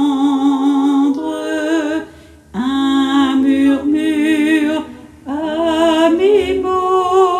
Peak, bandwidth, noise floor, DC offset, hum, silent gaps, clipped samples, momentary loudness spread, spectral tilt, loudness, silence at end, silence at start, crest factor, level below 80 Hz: 0 dBFS; 13.5 kHz; -40 dBFS; under 0.1%; none; none; under 0.1%; 10 LU; -4.5 dB/octave; -15 LUFS; 0 s; 0 s; 14 dB; -50 dBFS